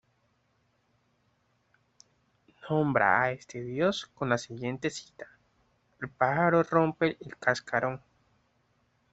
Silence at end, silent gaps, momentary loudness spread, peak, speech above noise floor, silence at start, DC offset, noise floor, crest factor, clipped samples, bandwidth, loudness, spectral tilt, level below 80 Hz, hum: 1.15 s; none; 18 LU; -8 dBFS; 44 dB; 2.65 s; under 0.1%; -72 dBFS; 24 dB; under 0.1%; 8.2 kHz; -28 LUFS; -6 dB/octave; -68 dBFS; none